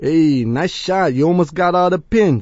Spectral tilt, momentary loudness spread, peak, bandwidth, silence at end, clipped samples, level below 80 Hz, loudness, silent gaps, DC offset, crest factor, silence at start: -7 dB/octave; 4 LU; -2 dBFS; 8 kHz; 0 s; under 0.1%; -42 dBFS; -16 LUFS; none; under 0.1%; 12 dB; 0 s